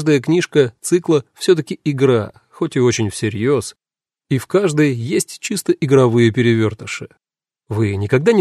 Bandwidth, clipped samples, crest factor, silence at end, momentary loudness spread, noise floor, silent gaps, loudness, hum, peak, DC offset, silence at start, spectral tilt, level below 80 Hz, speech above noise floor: 13.5 kHz; under 0.1%; 16 dB; 0 s; 9 LU; -68 dBFS; none; -17 LUFS; none; 0 dBFS; under 0.1%; 0 s; -6 dB/octave; -56 dBFS; 52 dB